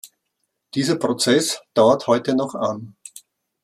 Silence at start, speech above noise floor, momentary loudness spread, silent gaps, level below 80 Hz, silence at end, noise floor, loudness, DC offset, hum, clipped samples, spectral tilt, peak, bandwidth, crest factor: 0.05 s; 56 dB; 19 LU; none; -68 dBFS; 0.45 s; -75 dBFS; -20 LUFS; under 0.1%; none; under 0.1%; -4 dB/octave; -4 dBFS; 15 kHz; 18 dB